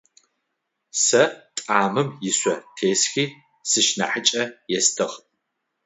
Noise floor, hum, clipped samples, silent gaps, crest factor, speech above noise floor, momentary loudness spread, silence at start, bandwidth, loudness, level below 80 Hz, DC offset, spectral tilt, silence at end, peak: -78 dBFS; none; under 0.1%; none; 22 dB; 56 dB; 10 LU; 0.95 s; 8.2 kHz; -21 LUFS; -72 dBFS; under 0.1%; -2 dB/octave; 0.7 s; -2 dBFS